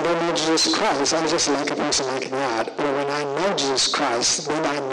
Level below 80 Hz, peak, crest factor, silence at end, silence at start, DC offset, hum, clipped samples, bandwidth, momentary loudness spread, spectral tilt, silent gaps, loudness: -56 dBFS; -12 dBFS; 10 dB; 0 s; 0 s; under 0.1%; none; under 0.1%; 12 kHz; 5 LU; -2 dB/octave; none; -21 LUFS